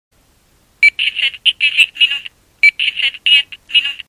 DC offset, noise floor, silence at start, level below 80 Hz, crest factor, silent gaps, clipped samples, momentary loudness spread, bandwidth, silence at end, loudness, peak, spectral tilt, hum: under 0.1%; -54 dBFS; 0.8 s; -58 dBFS; 16 dB; none; under 0.1%; 4 LU; 16 kHz; 0.1 s; -12 LUFS; 0 dBFS; 3 dB/octave; none